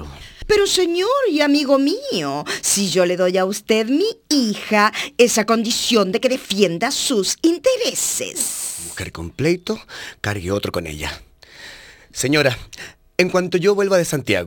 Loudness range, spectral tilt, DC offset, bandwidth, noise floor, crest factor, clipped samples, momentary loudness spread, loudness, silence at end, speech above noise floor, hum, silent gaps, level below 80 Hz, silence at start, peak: 6 LU; -3.5 dB/octave; under 0.1%; 19.5 kHz; -41 dBFS; 18 dB; under 0.1%; 13 LU; -18 LUFS; 0 s; 23 dB; none; none; -46 dBFS; 0 s; 0 dBFS